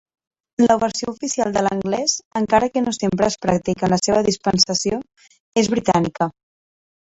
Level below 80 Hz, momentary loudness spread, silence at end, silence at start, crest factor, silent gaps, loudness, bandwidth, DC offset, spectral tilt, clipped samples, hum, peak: -50 dBFS; 8 LU; 0.9 s; 0.6 s; 18 dB; 2.25-2.31 s, 5.40-5.52 s; -19 LUFS; 8.4 kHz; under 0.1%; -4 dB/octave; under 0.1%; none; -2 dBFS